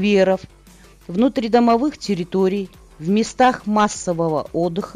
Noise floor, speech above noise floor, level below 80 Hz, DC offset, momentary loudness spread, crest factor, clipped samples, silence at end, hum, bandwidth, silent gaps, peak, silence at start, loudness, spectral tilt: -47 dBFS; 28 dB; -48 dBFS; under 0.1%; 9 LU; 14 dB; under 0.1%; 0.05 s; none; 11.5 kHz; none; -4 dBFS; 0 s; -19 LUFS; -5.5 dB/octave